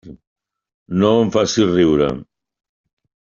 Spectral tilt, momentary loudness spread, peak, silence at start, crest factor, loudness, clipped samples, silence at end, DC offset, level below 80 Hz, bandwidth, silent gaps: -5.5 dB/octave; 8 LU; -2 dBFS; 0.05 s; 16 dB; -16 LUFS; under 0.1%; 1.15 s; under 0.1%; -48 dBFS; 7.4 kHz; 0.27-0.36 s, 0.74-0.86 s